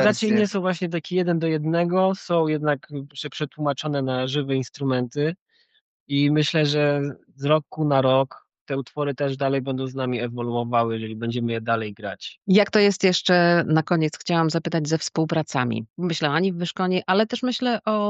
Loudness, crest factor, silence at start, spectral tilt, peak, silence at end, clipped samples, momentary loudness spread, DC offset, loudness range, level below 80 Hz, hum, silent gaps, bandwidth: -23 LUFS; 18 dB; 0 s; -6 dB/octave; -6 dBFS; 0 s; under 0.1%; 9 LU; under 0.1%; 5 LU; -70 dBFS; none; 5.41-5.46 s, 5.81-6.06 s, 8.61-8.66 s, 15.90-15.94 s; 8.4 kHz